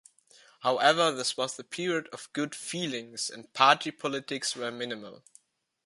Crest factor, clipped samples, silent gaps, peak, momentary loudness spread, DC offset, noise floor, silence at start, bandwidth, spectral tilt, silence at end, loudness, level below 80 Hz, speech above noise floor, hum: 26 dB; under 0.1%; none; -6 dBFS; 13 LU; under 0.1%; -63 dBFS; 0.6 s; 11.5 kHz; -2.5 dB/octave; 0.7 s; -29 LUFS; -80 dBFS; 33 dB; none